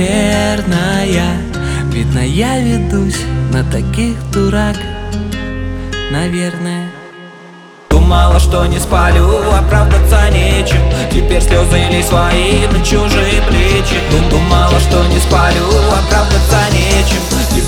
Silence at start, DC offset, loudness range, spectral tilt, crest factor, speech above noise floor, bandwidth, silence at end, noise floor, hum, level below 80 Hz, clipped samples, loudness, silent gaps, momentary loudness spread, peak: 0 s; under 0.1%; 6 LU; -5 dB/octave; 10 dB; 25 dB; 16 kHz; 0 s; -35 dBFS; none; -14 dBFS; under 0.1%; -12 LUFS; none; 9 LU; 0 dBFS